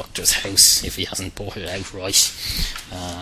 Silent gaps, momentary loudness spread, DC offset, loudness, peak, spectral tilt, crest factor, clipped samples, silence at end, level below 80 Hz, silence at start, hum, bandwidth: none; 18 LU; under 0.1%; -17 LUFS; 0 dBFS; -0.5 dB/octave; 22 dB; under 0.1%; 0 s; -36 dBFS; 0 s; none; 16 kHz